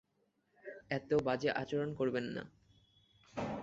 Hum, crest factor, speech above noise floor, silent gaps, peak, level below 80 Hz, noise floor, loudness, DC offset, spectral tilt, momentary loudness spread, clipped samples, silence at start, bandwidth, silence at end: none; 18 dB; 42 dB; none; -20 dBFS; -68 dBFS; -78 dBFS; -37 LUFS; under 0.1%; -5 dB/octave; 19 LU; under 0.1%; 0.65 s; 7.8 kHz; 0 s